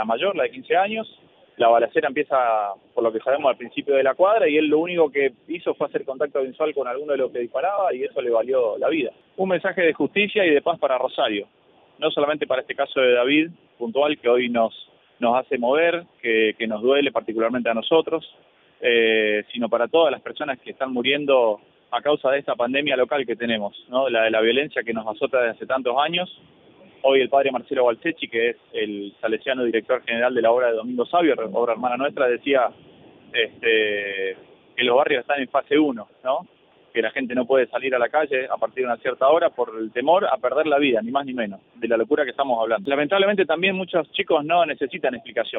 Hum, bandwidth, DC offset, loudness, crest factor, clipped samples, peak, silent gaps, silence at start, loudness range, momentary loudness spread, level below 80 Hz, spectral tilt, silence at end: none; 4 kHz; under 0.1%; -22 LUFS; 16 dB; under 0.1%; -4 dBFS; none; 0 s; 2 LU; 9 LU; -70 dBFS; -8 dB/octave; 0 s